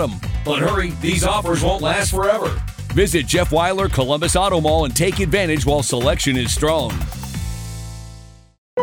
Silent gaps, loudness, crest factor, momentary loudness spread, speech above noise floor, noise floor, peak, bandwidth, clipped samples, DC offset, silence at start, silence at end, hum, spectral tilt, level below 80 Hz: 8.58-8.77 s; -18 LUFS; 16 dB; 11 LU; 23 dB; -40 dBFS; -2 dBFS; 19.5 kHz; under 0.1%; under 0.1%; 0 s; 0 s; none; -4.5 dB/octave; -28 dBFS